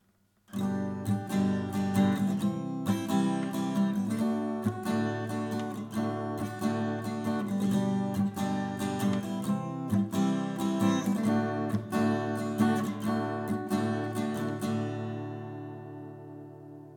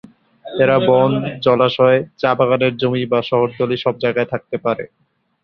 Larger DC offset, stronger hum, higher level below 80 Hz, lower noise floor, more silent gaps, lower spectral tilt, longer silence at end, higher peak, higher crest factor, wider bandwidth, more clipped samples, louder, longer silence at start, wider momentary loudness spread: neither; neither; second, -68 dBFS vs -56 dBFS; first, -67 dBFS vs -38 dBFS; neither; second, -6.5 dB/octave vs -8.5 dB/octave; second, 0 s vs 0.55 s; second, -14 dBFS vs 0 dBFS; about the same, 16 dB vs 16 dB; first, 18 kHz vs 5.8 kHz; neither; second, -31 LUFS vs -16 LUFS; about the same, 0.5 s vs 0.45 s; about the same, 9 LU vs 9 LU